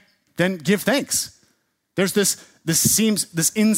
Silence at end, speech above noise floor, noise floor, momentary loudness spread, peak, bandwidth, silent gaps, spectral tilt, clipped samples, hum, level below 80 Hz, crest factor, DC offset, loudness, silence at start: 0 s; 48 dB; -67 dBFS; 11 LU; -4 dBFS; 16.5 kHz; none; -3.5 dB/octave; under 0.1%; none; -56 dBFS; 18 dB; under 0.1%; -20 LUFS; 0.4 s